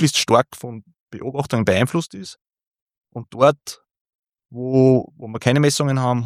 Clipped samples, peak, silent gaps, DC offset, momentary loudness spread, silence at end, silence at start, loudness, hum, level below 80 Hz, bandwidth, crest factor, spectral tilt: under 0.1%; -2 dBFS; 1.00-1.07 s, 2.41-2.45 s, 2.67-2.71 s, 2.82-2.87 s, 4.01-4.05 s, 4.15-4.23 s; under 0.1%; 21 LU; 0 s; 0 s; -18 LUFS; none; -58 dBFS; 15.5 kHz; 18 dB; -5.5 dB/octave